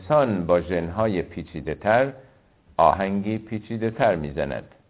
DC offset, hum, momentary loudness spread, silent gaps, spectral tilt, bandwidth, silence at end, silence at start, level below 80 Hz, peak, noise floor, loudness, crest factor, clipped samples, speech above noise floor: under 0.1%; none; 11 LU; none; -11 dB/octave; 4 kHz; 0.25 s; 0 s; -46 dBFS; -4 dBFS; -56 dBFS; -24 LUFS; 20 dB; under 0.1%; 33 dB